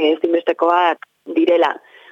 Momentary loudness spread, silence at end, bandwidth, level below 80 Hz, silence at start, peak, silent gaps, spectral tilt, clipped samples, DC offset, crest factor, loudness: 10 LU; 0.35 s; 6.8 kHz; -74 dBFS; 0 s; -2 dBFS; none; -4.5 dB/octave; under 0.1%; under 0.1%; 14 dB; -17 LUFS